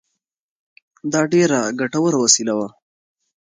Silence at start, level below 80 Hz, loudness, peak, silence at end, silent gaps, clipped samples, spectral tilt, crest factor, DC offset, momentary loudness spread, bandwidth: 1.05 s; -66 dBFS; -17 LUFS; 0 dBFS; 0.7 s; none; under 0.1%; -3.5 dB/octave; 20 dB; under 0.1%; 11 LU; 10 kHz